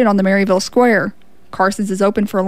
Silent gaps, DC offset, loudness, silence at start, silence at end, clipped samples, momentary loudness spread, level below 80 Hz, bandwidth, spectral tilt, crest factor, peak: none; 1%; -15 LUFS; 0 s; 0 s; under 0.1%; 6 LU; -50 dBFS; 15.5 kHz; -5.5 dB/octave; 12 dB; -2 dBFS